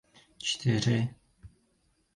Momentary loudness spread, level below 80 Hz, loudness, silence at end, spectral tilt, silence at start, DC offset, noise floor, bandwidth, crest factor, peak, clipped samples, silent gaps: 9 LU; -60 dBFS; -30 LUFS; 0.7 s; -5 dB/octave; 0.4 s; under 0.1%; -71 dBFS; 11 kHz; 20 dB; -12 dBFS; under 0.1%; none